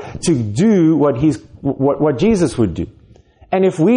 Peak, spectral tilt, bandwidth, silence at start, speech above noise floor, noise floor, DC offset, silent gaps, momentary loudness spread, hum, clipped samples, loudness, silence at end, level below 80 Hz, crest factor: -4 dBFS; -7 dB/octave; 10.5 kHz; 0 s; 32 dB; -46 dBFS; under 0.1%; none; 10 LU; none; under 0.1%; -16 LUFS; 0 s; -40 dBFS; 12 dB